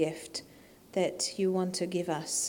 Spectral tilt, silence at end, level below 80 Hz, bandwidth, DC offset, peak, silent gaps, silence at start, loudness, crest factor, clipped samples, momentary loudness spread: -3.5 dB/octave; 0 s; -70 dBFS; 19 kHz; under 0.1%; -16 dBFS; none; 0 s; -32 LUFS; 18 dB; under 0.1%; 10 LU